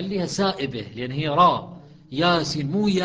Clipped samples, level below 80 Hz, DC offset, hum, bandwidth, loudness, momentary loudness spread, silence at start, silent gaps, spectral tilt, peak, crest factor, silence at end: under 0.1%; -54 dBFS; under 0.1%; none; 9.6 kHz; -22 LUFS; 12 LU; 0 s; none; -5.5 dB/octave; -4 dBFS; 18 dB; 0 s